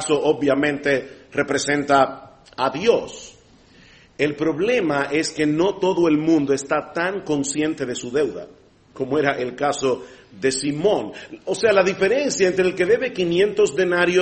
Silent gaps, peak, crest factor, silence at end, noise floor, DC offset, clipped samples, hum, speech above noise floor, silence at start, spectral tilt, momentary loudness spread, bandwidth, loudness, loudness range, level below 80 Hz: none; -2 dBFS; 18 dB; 0 s; -51 dBFS; under 0.1%; under 0.1%; none; 31 dB; 0 s; -4.5 dB/octave; 8 LU; 8.8 kHz; -20 LUFS; 4 LU; -56 dBFS